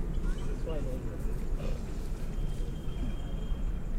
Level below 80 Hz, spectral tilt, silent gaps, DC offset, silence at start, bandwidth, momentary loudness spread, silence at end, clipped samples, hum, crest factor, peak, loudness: -32 dBFS; -7 dB/octave; none; under 0.1%; 0 s; 11.5 kHz; 3 LU; 0 s; under 0.1%; none; 12 dB; -20 dBFS; -38 LUFS